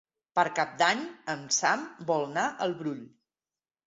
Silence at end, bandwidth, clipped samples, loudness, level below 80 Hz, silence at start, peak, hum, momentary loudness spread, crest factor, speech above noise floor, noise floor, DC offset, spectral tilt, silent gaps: 0.8 s; 8.2 kHz; under 0.1%; -29 LUFS; -76 dBFS; 0.35 s; -10 dBFS; none; 10 LU; 22 dB; over 61 dB; under -90 dBFS; under 0.1%; -2.5 dB/octave; none